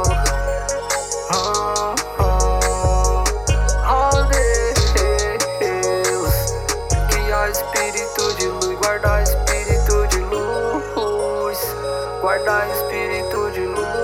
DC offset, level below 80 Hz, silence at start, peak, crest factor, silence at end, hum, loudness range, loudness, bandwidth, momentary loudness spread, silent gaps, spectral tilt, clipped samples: under 0.1%; -22 dBFS; 0 s; -4 dBFS; 14 dB; 0 s; none; 3 LU; -19 LUFS; 17 kHz; 5 LU; none; -3.5 dB/octave; under 0.1%